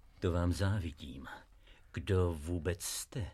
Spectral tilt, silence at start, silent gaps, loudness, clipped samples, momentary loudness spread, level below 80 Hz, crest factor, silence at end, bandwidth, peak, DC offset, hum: -5.5 dB/octave; 0.2 s; none; -36 LUFS; under 0.1%; 15 LU; -50 dBFS; 16 dB; 0 s; 14 kHz; -20 dBFS; under 0.1%; none